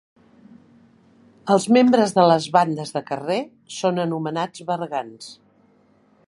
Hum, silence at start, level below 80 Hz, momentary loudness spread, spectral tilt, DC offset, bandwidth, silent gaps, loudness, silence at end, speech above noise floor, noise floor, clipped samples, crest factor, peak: none; 1.45 s; -70 dBFS; 18 LU; -5.5 dB/octave; under 0.1%; 11.5 kHz; none; -20 LUFS; 0.95 s; 38 dB; -58 dBFS; under 0.1%; 20 dB; -2 dBFS